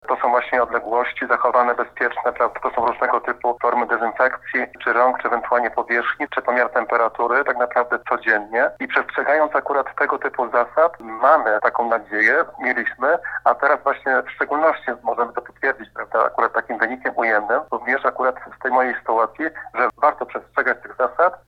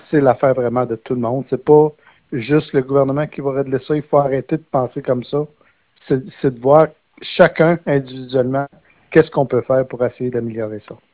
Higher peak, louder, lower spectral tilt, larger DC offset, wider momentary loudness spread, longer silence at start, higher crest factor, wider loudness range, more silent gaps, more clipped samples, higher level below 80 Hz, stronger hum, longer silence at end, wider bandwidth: about the same, -2 dBFS vs 0 dBFS; second, -20 LUFS vs -17 LUFS; second, -5.5 dB/octave vs -11.5 dB/octave; neither; second, 6 LU vs 11 LU; about the same, 0.05 s vs 0.1 s; about the same, 18 dB vs 16 dB; about the same, 2 LU vs 3 LU; neither; neither; second, -60 dBFS vs -52 dBFS; neither; about the same, 0.1 s vs 0.2 s; first, 6.2 kHz vs 4 kHz